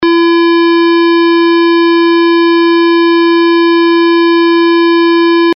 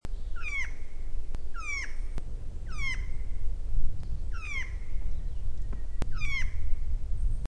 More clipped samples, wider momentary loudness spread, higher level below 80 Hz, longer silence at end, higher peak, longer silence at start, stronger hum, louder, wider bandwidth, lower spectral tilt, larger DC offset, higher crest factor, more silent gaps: neither; second, 0 LU vs 8 LU; second, -60 dBFS vs -30 dBFS; about the same, 0 s vs 0 s; first, -6 dBFS vs -12 dBFS; about the same, 0 s vs 0.05 s; neither; first, -8 LUFS vs -37 LUFS; second, 5.6 kHz vs 7 kHz; second, 0.5 dB/octave vs -4.5 dB/octave; neither; second, 2 dB vs 14 dB; neither